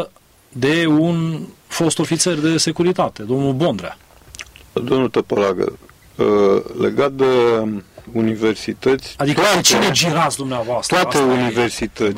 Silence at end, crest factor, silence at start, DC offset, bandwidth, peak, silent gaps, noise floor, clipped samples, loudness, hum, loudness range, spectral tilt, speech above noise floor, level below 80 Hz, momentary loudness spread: 0 s; 16 dB; 0 s; under 0.1%; 16 kHz; -2 dBFS; none; -44 dBFS; under 0.1%; -17 LUFS; none; 4 LU; -4 dB/octave; 27 dB; -50 dBFS; 13 LU